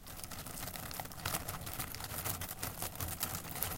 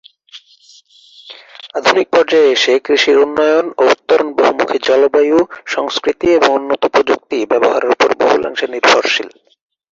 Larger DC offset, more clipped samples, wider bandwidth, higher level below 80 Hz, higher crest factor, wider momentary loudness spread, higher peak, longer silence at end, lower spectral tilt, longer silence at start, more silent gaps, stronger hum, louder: neither; neither; first, 17 kHz vs 7.8 kHz; about the same, -54 dBFS vs -56 dBFS; first, 30 dB vs 14 dB; about the same, 5 LU vs 7 LU; second, -12 dBFS vs 0 dBFS; second, 0 s vs 0.65 s; about the same, -2.5 dB/octave vs -2.5 dB/octave; second, 0 s vs 0.35 s; neither; neither; second, -40 LUFS vs -13 LUFS